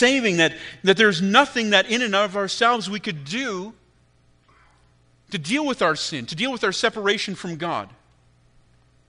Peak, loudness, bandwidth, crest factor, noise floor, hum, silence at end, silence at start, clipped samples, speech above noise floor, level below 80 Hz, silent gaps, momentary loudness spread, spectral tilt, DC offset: 0 dBFS; -21 LUFS; 10.5 kHz; 22 dB; -59 dBFS; none; 1.2 s; 0 s; under 0.1%; 38 dB; -62 dBFS; none; 12 LU; -3.5 dB/octave; under 0.1%